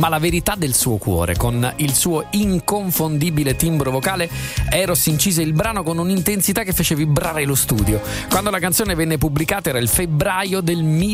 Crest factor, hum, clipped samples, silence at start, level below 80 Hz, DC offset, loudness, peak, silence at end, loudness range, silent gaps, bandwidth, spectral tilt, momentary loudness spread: 16 dB; none; under 0.1%; 0 s; -32 dBFS; under 0.1%; -18 LUFS; -2 dBFS; 0 s; 1 LU; none; 16 kHz; -4.5 dB/octave; 3 LU